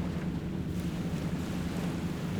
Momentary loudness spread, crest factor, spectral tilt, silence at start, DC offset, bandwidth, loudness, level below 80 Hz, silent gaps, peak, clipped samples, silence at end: 1 LU; 12 dB; -7 dB/octave; 0 s; under 0.1%; 19.5 kHz; -34 LUFS; -46 dBFS; none; -22 dBFS; under 0.1%; 0 s